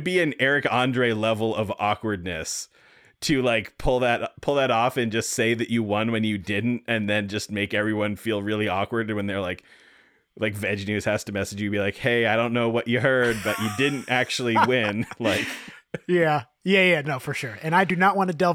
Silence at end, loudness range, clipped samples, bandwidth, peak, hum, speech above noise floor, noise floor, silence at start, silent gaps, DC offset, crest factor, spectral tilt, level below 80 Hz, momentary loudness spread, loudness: 0 s; 5 LU; under 0.1%; 17.5 kHz; -4 dBFS; none; 34 dB; -58 dBFS; 0 s; none; under 0.1%; 20 dB; -5 dB/octave; -48 dBFS; 9 LU; -24 LUFS